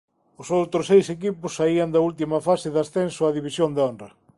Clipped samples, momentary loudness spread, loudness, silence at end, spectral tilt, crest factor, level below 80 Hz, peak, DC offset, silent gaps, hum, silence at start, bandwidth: under 0.1%; 9 LU; -22 LUFS; 0.3 s; -6 dB/octave; 18 dB; -60 dBFS; -6 dBFS; under 0.1%; none; none; 0.4 s; 11.5 kHz